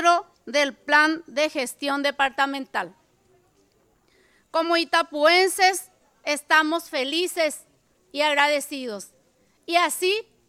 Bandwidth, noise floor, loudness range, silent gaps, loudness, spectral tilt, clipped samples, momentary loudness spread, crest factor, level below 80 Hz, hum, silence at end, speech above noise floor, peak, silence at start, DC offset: 16.5 kHz; -63 dBFS; 5 LU; none; -22 LUFS; -0.5 dB/octave; under 0.1%; 13 LU; 18 dB; -70 dBFS; none; 0.25 s; 41 dB; -6 dBFS; 0 s; under 0.1%